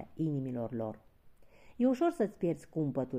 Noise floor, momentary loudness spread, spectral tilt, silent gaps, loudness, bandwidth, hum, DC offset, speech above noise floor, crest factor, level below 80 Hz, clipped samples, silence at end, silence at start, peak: -58 dBFS; 10 LU; -9 dB/octave; none; -34 LUFS; 14.5 kHz; none; under 0.1%; 25 dB; 16 dB; -66 dBFS; under 0.1%; 0 s; 0 s; -18 dBFS